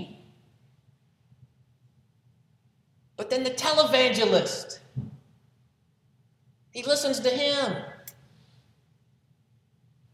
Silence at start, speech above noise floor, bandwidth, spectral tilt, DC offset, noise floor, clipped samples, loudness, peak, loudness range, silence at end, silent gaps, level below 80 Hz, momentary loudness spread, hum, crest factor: 0 s; 41 dB; 16.5 kHz; -3 dB/octave; under 0.1%; -66 dBFS; under 0.1%; -25 LUFS; -6 dBFS; 5 LU; 2.05 s; none; -72 dBFS; 23 LU; none; 24 dB